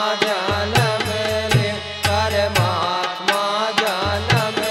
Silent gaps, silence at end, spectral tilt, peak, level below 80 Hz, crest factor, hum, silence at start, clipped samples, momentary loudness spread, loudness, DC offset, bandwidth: none; 0 s; -4 dB/octave; -2 dBFS; -42 dBFS; 18 dB; none; 0 s; under 0.1%; 3 LU; -19 LUFS; under 0.1%; 16.5 kHz